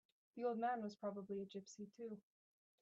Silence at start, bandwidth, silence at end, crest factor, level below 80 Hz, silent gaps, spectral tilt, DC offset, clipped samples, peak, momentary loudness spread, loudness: 0.35 s; 8 kHz; 0.6 s; 16 dB; under -90 dBFS; none; -5.5 dB/octave; under 0.1%; under 0.1%; -32 dBFS; 14 LU; -47 LUFS